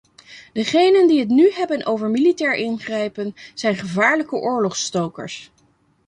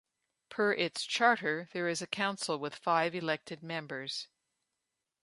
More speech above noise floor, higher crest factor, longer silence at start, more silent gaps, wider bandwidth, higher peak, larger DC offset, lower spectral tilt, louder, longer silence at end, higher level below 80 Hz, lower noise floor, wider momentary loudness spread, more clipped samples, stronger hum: second, 41 dB vs 54 dB; second, 16 dB vs 24 dB; second, 0.3 s vs 0.5 s; neither; about the same, 10.5 kHz vs 11.5 kHz; first, -4 dBFS vs -12 dBFS; neither; about the same, -4.5 dB/octave vs -3.5 dB/octave; first, -18 LUFS vs -33 LUFS; second, 0.6 s vs 1 s; first, -64 dBFS vs -82 dBFS; second, -60 dBFS vs -87 dBFS; first, 15 LU vs 12 LU; neither; neither